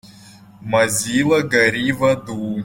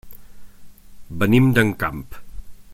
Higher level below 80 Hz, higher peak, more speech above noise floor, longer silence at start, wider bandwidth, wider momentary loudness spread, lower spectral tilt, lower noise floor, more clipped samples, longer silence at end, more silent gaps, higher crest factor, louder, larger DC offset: second, -52 dBFS vs -42 dBFS; about the same, -2 dBFS vs -2 dBFS; first, 26 dB vs 22 dB; first, 0.25 s vs 0.05 s; about the same, 16.5 kHz vs 16.5 kHz; second, 8 LU vs 22 LU; second, -4 dB/octave vs -7 dB/octave; first, -44 dBFS vs -39 dBFS; neither; about the same, 0 s vs 0 s; neither; about the same, 16 dB vs 20 dB; about the same, -17 LUFS vs -18 LUFS; neither